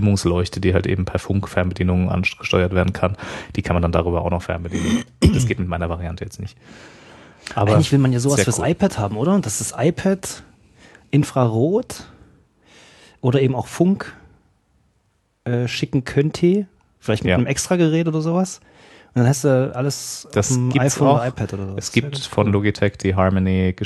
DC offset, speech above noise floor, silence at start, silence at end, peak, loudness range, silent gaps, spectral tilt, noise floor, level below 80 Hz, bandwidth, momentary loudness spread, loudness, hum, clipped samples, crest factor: under 0.1%; 46 dB; 0 s; 0 s; 0 dBFS; 4 LU; none; -6 dB/octave; -65 dBFS; -40 dBFS; 13 kHz; 10 LU; -20 LUFS; none; under 0.1%; 18 dB